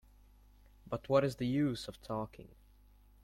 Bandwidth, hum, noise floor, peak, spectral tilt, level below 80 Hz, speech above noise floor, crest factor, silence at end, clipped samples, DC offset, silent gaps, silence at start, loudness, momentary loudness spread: 16 kHz; 50 Hz at -60 dBFS; -62 dBFS; -16 dBFS; -7 dB/octave; -60 dBFS; 27 dB; 20 dB; 0.75 s; under 0.1%; under 0.1%; none; 0.85 s; -36 LUFS; 13 LU